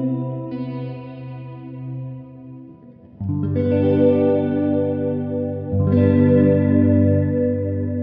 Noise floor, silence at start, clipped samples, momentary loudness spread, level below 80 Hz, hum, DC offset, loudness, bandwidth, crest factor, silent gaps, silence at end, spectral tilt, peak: -43 dBFS; 0 s; under 0.1%; 19 LU; -54 dBFS; none; under 0.1%; -19 LUFS; 4.4 kHz; 16 dB; none; 0 s; -12.5 dB/octave; -2 dBFS